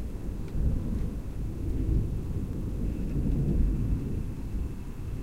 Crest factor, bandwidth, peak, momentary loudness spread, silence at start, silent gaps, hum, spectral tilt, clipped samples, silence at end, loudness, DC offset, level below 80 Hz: 16 dB; 14 kHz; -14 dBFS; 8 LU; 0 s; none; none; -9 dB/octave; under 0.1%; 0 s; -32 LUFS; 0.6%; -32 dBFS